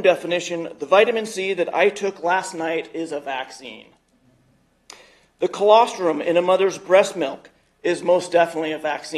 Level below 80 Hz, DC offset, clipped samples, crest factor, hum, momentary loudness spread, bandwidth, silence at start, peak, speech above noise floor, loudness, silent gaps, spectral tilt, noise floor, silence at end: -70 dBFS; under 0.1%; under 0.1%; 20 dB; none; 13 LU; 12.5 kHz; 0 s; 0 dBFS; 41 dB; -20 LUFS; none; -4 dB/octave; -61 dBFS; 0 s